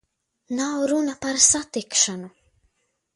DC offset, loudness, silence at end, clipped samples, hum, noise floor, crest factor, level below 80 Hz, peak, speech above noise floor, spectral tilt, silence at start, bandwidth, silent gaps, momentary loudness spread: under 0.1%; -21 LUFS; 0.9 s; under 0.1%; none; -70 dBFS; 22 dB; -58 dBFS; -2 dBFS; 48 dB; -1.5 dB/octave; 0.5 s; 11.5 kHz; none; 12 LU